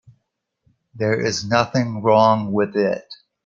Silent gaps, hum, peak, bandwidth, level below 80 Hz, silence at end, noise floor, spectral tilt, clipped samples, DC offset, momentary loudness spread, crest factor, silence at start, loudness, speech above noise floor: none; none; -2 dBFS; 7.6 kHz; -58 dBFS; 0.3 s; -74 dBFS; -5.5 dB/octave; under 0.1%; under 0.1%; 8 LU; 18 dB; 0.95 s; -19 LUFS; 55 dB